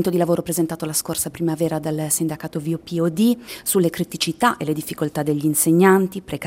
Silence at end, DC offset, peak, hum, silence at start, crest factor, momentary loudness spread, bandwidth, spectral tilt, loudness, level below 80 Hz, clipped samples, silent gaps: 0 s; under 0.1%; -2 dBFS; none; 0 s; 18 dB; 10 LU; 16.5 kHz; -4.5 dB/octave; -20 LUFS; -56 dBFS; under 0.1%; none